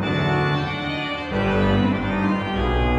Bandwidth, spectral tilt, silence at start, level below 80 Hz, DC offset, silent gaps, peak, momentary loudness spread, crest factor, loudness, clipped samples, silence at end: 7.8 kHz; -7.5 dB/octave; 0 s; -32 dBFS; under 0.1%; none; -8 dBFS; 6 LU; 14 dB; -22 LUFS; under 0.1%; 0 s